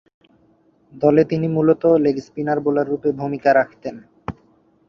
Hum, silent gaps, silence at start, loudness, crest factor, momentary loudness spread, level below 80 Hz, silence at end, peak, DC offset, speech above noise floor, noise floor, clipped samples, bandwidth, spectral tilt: none; none; 0.95 s; -18 LUFS; 18 dB; 18 LU; -54 dBFS; 0.55 s; -2 dBFS; under 0.1%; 40 dB; -58 dBFS; under 0.1%; 6.8 kHz; -9 dB/octave